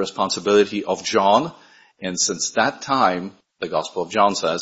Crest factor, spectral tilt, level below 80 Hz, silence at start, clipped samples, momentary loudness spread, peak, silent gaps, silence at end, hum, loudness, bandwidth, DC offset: 18 dB; -3 dB/octave; -62 dBFS; 0 s; under 0.1%; 12 LU; -2 dBFS; none; 0 s; none; -20 LUFS; 8 kHz; under 0.1%